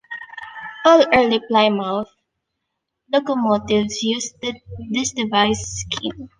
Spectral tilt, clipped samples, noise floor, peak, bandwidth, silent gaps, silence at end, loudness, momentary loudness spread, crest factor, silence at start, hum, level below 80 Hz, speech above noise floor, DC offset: -3.5 dB/octave; under 0.1%; -78 dBFS; -2 dBFS; 10 kHz; none; 0.1 s; -19 LUFS; 19 LU; 18 dB; 0.1 s; none; -50 dBFS; 59 dB; under 0.1%